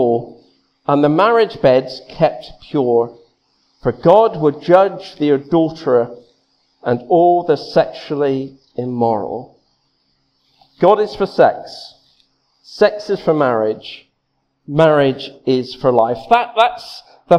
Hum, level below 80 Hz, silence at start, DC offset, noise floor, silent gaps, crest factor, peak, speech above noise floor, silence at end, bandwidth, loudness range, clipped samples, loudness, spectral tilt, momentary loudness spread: none; -52 dBFS; 0 s; under 0.1%; -68 dBFS; none; 16 dB; 0 dBFS; 53 dB; 0 s; 10 kHz; 4 LU; under 0.1%; -15 LUFS; -7.5 dB/octave; 15 LU